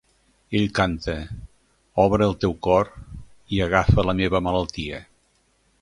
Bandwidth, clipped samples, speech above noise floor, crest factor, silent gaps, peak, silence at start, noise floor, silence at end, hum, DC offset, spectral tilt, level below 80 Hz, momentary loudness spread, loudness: 11 kHz; under 0.1%; 43 dB; 22 dB; none; -2 dBFS; 0.5 s; -64 dBFS; 0.8 s; none; under 0.1%; -6.5 dB/octave; -36 dBFS; 17 LU; -22 LUFS